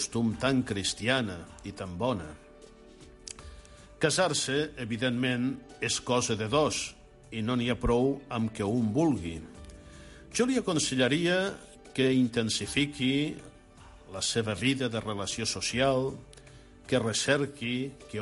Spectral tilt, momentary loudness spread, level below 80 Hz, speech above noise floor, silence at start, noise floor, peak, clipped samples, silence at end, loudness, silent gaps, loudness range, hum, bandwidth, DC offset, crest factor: -4 dB/octave; 17 LU; -50 dBFS; 23 dB; 0 s; -52 dBFS; -12 dBFS; under 0.1%; 0 s; -29 LUFS; none; 4 LU; none; 11.5 kHz; under 0.1%; 18 dB